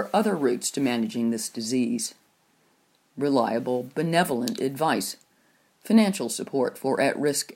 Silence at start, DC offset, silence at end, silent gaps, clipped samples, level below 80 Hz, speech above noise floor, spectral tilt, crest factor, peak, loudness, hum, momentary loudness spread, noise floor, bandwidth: 0 s; under 0.1%; 0 s; none; under 0.1%; -76 dBFS; 40 dB; -4.5 dB/octave; 18 dB; -6 dBFS; -25 LUFS; none; 7 LU; -65 dBFS; 16.5 kHz